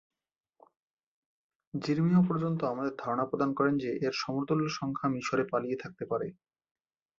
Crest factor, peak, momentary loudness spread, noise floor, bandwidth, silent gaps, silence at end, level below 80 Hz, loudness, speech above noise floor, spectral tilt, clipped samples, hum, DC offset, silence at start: 18 dB; -14 dBFS; 10 LU; -73 dBFS; 7.4 kHz; none; 0.85 s; -70 dBFS; -31 LUFS; 43 dB; -7 dB/octave; under 0.1%; none; under 0.1%; 1.75 s